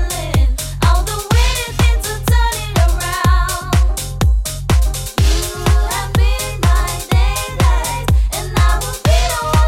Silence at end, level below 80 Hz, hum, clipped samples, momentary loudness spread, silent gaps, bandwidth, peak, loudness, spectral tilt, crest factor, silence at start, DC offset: 0 s; -16 dBFS; none; under 0.1%; 3 LU; none; 16.5 kHz; -2 dBFS; -16 LUFS; -4.5 dB/octave; 12 dB; 0 s; under 0.1%